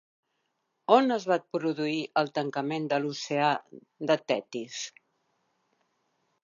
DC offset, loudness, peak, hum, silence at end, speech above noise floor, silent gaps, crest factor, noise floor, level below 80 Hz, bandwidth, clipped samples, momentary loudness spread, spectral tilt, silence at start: under 0.1%; -28 LUFS; -6 dBFS; none; 1.55 s; 50 dB; none; 24 dB; -78 dBFS; -84 dBFS; 7.6 kHz; under 0.1%; 14 LU; -4.5 dB/octave; 0.9 s